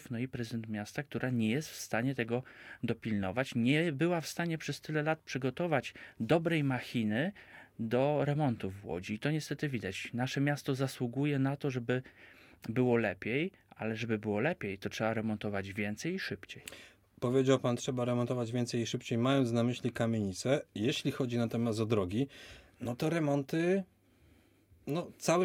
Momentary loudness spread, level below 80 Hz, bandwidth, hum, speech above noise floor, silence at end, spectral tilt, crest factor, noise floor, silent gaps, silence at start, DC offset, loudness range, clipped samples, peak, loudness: 10 LU; -68 dBFS; 16.5 kHz; none; 32 dB; 0 s; -6 dB/octave; 20 dB; -65 dBFS; none; 0 s; under 0.1%; 3 LU; under 0.1%; -14 dBFS; -34 LUFS